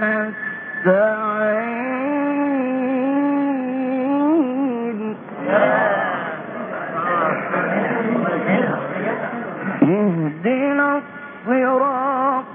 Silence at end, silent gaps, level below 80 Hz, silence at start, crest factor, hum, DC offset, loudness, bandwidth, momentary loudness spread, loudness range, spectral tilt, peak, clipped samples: 0 s; none; -68 dBFS; 0 s; 18 dB; none; under 0.1%; -20 LUFS; 3.7 kHz; 10 LU; 1 LU; -12 dB/octave; -2 dBFS; under 0.1%